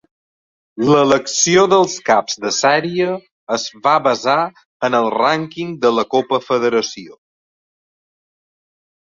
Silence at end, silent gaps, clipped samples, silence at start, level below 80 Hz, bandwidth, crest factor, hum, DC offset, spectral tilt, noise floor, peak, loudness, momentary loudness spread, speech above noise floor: 1.9 s; 3.32-3.47 s, 4.65-4.80 s; under 0.1%; 0.75 s; -60 dBFS; 7.8 kHz; 16 dB; none; under 0.1%; -3.5 dB/octave; under -90 dBFS; -2 dBFS; -16 LUFS; 10 LU; over 74 dB